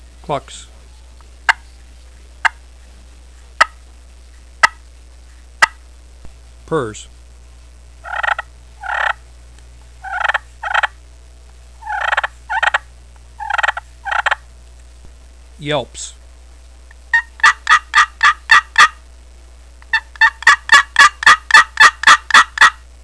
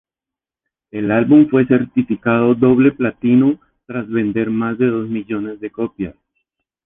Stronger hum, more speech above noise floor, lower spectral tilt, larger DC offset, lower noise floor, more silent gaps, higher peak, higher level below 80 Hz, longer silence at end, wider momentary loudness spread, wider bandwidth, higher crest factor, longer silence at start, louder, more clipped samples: neither; second, 18 dB vs 73 dB; second, -0.5 dB/octave vs -11 dB/octave; first, 0.3% vs under 0.1%; second, -40 dBFS vs -88 dBFS; neither; about the same, 0 dBFS vs -2 dBFS; first, -40 dBFS vs -52 dBFS; second, 0.3 s vs 0.75 s; first, 19 LU vs 15 LU; first, 11 kHz vs 3.8 kHz; about the same, 16 dB vs 14 dB; second, 0.3 s vs 0.95 s; first, -13 LUFS vs -16 LUFS; first, 0.3% vs under 0.1%